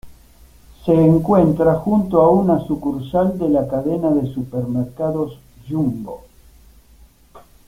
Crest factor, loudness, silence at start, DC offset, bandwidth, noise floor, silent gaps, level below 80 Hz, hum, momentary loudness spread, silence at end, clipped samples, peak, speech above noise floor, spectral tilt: 16 dB; -18 LUFS; 0.05 s; under 0.1%; 16 kHz; -49 dBFS; none; -44 dBFS; none; 12 LU; 0.3 s; under 0.1%; -2 dBFS; 32 dB; -10 dB/octave